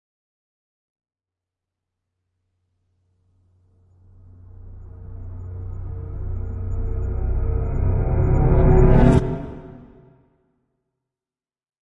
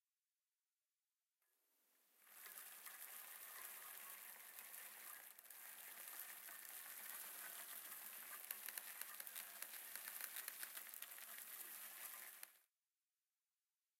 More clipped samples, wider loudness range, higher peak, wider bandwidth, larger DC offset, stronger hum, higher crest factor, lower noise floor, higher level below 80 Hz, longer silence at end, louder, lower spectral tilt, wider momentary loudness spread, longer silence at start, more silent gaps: neither; first, 19 LU vs 6 LU; first, -2 dBFS vs -24 dBFS; second, 7.8 kHz vs 16.5 kHz; neither; neither; second, 20 dB vs 32 dB; about the same, under -90 dBFS vs under -90 dBFS; first, -26 dBFS vs under -90 dBFS; first, 2 s vs 1.35 s; first, -21 LUFS vs -53 LUFS; first, -10 dB/octave vs 2.5 dB/octave; first, 24 LU vs 6 LU; first, 4.55 s vs 1.9 s; neither